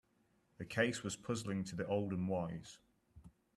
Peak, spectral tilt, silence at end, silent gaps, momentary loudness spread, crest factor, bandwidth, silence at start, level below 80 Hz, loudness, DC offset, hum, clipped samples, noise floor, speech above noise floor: -18 dBFS; -5.5 dB/octave; 0.25 s; none; 12 LU; 22 dB; 13 kHz; 0.6 s; -72 dBFS; -40 LUFS; under 0.1%; none; under 0.1%; -76 dBFS; 37 dB